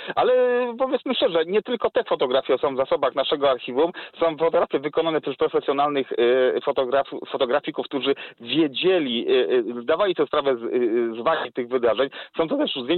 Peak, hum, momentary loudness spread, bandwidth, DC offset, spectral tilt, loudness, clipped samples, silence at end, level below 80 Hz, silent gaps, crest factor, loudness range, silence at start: -10 dBFS; none; 5 LU; 4.4 kHz; under 0.1%; -8.5 dB/octave; -22 LUFS; under 0.1%; 0 s; -62 dBFS; none; 12 dB; 1 LU; 0 s